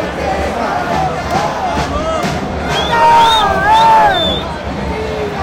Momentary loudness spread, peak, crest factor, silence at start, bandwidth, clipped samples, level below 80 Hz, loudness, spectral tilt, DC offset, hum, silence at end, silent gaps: 11 LU; -2 dBFS; 12 dB; 0 s; 16 kHz; under 0.1%; -28 dBFS; -13 LUFS; -4.5 dB/octave; under 0.1%; none; 0 s; none